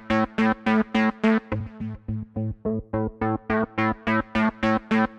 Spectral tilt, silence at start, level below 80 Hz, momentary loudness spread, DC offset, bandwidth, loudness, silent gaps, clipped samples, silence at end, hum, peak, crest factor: -7.5 dB/octave; 0 s; -46 dBFS; 10 LU; under 0.1%; 7.4 kHz; -25 LUFS; none; under 0.1%; 0 s; none; -6 dBFS; 18 dB